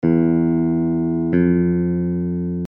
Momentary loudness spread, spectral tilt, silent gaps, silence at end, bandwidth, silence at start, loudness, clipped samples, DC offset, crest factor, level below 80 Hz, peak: 5 LU; -12.5 dB/octave; none; 0 s; 3.1 kHz; 0.05 s; -19 LUFS; under 0.1%; under 0.1%; 14 dB; -44 dBFS; -4 dBFS